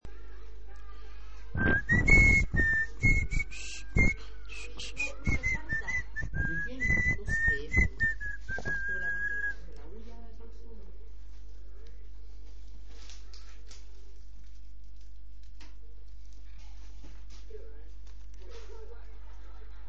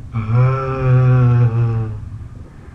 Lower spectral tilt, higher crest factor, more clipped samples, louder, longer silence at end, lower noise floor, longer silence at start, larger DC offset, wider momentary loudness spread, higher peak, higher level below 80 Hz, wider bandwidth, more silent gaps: second, -5 dB/octave vs -10.5 dB/octave; first, 24 dB vs 10 dB; neither; second, -29 LUFS vs -15 LUFS; about the same, 0 s vs 0.05 s; first, -49 dBFS vs -34 dBFS; about the same, 0 s vs 0.05 s; first, 2% vs under 0.1%; first, 24 LU vs 19 LU; second, -8 dBFS vs -4 dBFS; about the same, -38 dBFS vs -34 dBFS; first, 8.6 kHz vs 3.6 kHz; neither